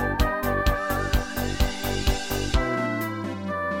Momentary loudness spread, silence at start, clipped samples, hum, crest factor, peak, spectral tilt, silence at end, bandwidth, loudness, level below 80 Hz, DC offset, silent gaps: 5 LU; 0 s; under 0.1%; none; 16 dB; -8 dBFS; -5 dB/octave; 0 s; 17 kHz; -26 LUFS; -30 dBFS; under 0.1%; none